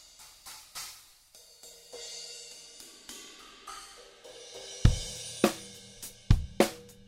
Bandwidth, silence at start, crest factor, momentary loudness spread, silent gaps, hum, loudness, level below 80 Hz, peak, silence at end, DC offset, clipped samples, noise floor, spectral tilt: 16 kHz; 0.2 s; 28 dB; 22 LU; none; none; -33 LUFS; -38 dBFS; -6 dBFS; 0.15 s; under 0.1%; under 0.1%; -57 dBFS; -5 dB/octave